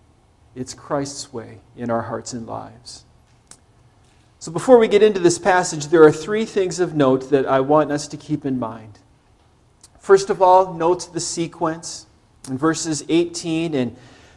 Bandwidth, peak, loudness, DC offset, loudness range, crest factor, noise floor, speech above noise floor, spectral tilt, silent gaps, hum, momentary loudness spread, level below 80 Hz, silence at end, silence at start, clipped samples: 12 kHz; 0 dBFS; -18 LUFS; under 0.1%; 13 LU; 20 dB; -55 dBFS; 37 dB; -5 dB/octave; none; none; 19 LU; -56 dBFS; 0.4 s; 0.55 s; under 0.1%